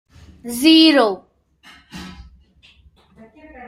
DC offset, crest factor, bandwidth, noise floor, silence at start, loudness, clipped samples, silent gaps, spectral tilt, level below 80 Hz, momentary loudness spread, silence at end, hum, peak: under 0.1%; 20 dB; 15.5 kHz; -52 dBFS; 0.45 s; -13 LUFS; under 0.1%; none; -3 dB/octave; -52 dBFS; 27 LU; 0.05 s; none; 0 dBFS